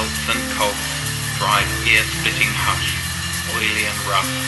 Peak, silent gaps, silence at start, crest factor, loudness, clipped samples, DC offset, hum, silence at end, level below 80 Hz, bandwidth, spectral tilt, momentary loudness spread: -2 dBFS; none; 0 s; 18 dB; -18 LUFS; under 0.1%; under 0.1%; none; 0 s; -36 dBFS; 12.5 kHz; -2.5 dB/octave; 7 LU